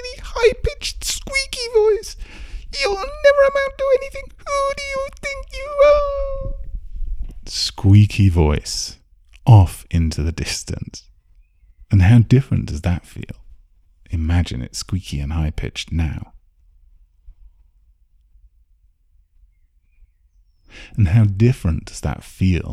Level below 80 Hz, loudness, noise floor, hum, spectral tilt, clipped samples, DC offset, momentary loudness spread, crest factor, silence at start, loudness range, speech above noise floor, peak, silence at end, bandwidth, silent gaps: -30 dBFS; -18 LUFS; -57 dBFS; none; -6 dB/octave; under 0.1%; under 0.1%; 20 LU; 18 dB; 0 s; 10 LU; 40 dB; 0 dBFS; 0 s; 13.5 kHz; none